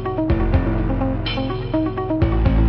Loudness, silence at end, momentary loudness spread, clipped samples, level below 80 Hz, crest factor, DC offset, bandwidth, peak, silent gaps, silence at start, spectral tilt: -21 LUFS; 0 s; 4 LU; under 0.1%; -24 dBFS; 14 dB; under 0.1%; 5.6 kHz; -4 dBFS; none; 0 s; -10 dB/octave